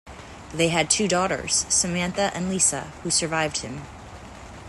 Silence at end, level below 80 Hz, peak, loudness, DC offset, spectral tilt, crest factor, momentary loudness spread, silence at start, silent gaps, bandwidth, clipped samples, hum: 0 s; -48 dBFS; -2 dBFS; -22 LUFS; under 0.1%; -2.5 dB/octave; 22 dB; 21 LU; 0.05 s; none; 12.5 kHz; under 0.1%; none